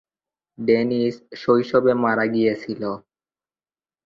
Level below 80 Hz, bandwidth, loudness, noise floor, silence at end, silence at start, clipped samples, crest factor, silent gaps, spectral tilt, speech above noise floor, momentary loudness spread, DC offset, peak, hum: -62 dBFS; 7 kHz; -21 LUFS; under -90 dBFS; 1.05 s; 0.6 s; under 0.1%; 20 dB; none; -7.5 dB/octave; over 70 dB; 10 LU; under 0.1%; -4 dBFS; none